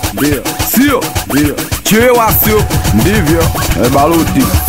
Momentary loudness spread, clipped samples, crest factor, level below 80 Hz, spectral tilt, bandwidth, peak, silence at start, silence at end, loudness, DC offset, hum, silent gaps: 6 LU; under 0.1%; 10 dB; -22 dBFS; -4.5 dB/octave; 16.5 kHz; 0 dBFS; 0 s; 0 s; -10 LUFS; 1%; none; none